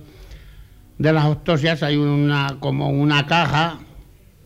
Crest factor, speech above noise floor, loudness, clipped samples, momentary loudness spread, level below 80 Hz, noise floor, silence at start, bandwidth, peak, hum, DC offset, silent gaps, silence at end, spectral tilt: 16 dB; 27 dB; -19 LUFS; under 0.1%; 6 LU; -44 dBFS; -45 dBFS; 0 s; 8.2 kHz; -4 dBFS; none; under 0.1%; none; 0.45 s; -6.5 dB/octave